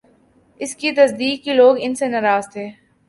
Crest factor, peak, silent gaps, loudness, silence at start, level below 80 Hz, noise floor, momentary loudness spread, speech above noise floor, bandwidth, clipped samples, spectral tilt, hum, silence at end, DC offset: 18 dB; 0 dBFS; none; -17 LUFS; 0.6 s; -66 dBFS; -55 dBFS; 17 LU; 38 dB; 11.5 kHz; under 0.1%; -3.5 dB/octave; none; 0.35 s; under 0.1%